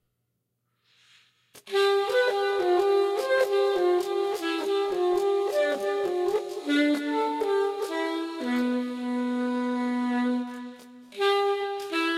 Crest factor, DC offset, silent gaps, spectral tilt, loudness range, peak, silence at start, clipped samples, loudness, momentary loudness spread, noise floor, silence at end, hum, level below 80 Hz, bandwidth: 14 dB; under 0.1%; none; -3 dB/octave; 4 LU; -12 dBFS; 1.55 s; under 0.1%; -26 LUFS; 6 LU; -78 dBFS; 0 s; none; -74 dBFS; 14.5 kHz